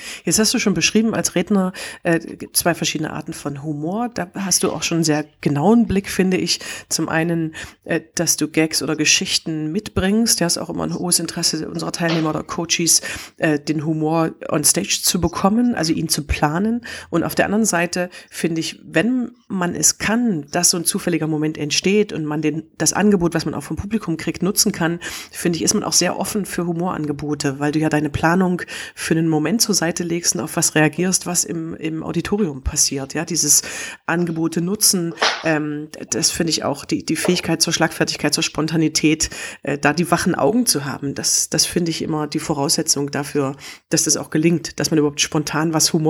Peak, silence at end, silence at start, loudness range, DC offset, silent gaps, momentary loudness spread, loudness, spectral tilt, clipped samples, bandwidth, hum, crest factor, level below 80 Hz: 0 dBFS; 0 s; 0 s; 2 LU; under 0.1%; none; 9 LU; -19 LUFS; -3.5 dB/octave; under 0.1%; 17 kHz; none; 18 dB; -44 dBFS